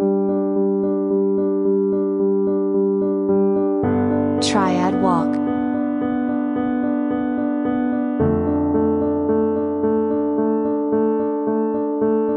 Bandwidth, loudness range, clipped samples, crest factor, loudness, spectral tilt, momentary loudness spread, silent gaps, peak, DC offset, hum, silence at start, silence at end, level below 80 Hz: 10 kHz; 2 LU; under 0.1%; 14 dB; -19 LUFS; -7 dB/octave; 3 LU; none; -6 dBFS; under 0.1%; none; 0 s; 0 s; -50 dBFS